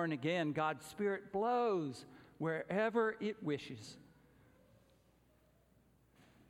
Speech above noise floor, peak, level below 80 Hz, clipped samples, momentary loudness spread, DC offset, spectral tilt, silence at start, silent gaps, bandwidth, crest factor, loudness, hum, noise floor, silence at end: 33 dB; -22 dBFS; -76 dBFS; under 0.1%; 15 LU; under 0.1%; -6 dB/octave; 0 s; none; 15 kHz; 18 dB; -38 LUFS; none; -71 dBFS; 2.5 s